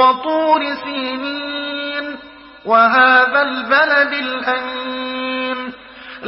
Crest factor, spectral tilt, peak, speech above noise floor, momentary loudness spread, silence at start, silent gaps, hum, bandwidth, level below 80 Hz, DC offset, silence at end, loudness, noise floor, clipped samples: 16 dB; -7.5 dB/octave; 0 dBFS; 23 dB; 17 LU; 0 s; none; none; 5.8 kHz; -58 dBFS; under 0.1%; 0 s; -16 LUFS; -38 dBFS; under 0.1%